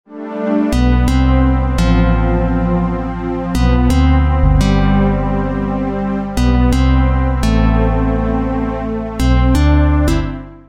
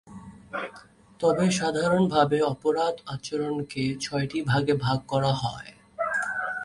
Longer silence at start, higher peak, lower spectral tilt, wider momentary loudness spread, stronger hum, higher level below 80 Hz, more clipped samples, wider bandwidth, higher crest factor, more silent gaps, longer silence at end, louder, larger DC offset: about the same, 0.1 s vs 0.05 s; first, 0 dBFS vs -6 dBFS; first, -7.5 dB/octave vs -5.5 dB/octave; second, 7 LU vs 13 LU; neither; first, -16 dBFS vs -58 dBFS; neither; about the same, 12.5 kHz vs 11.5 kHz; second, 12 dB vs 20 dB; neither; about the same, 0.1 s vs 0 s; first, -15 LUFS vs -26 LUFS; neither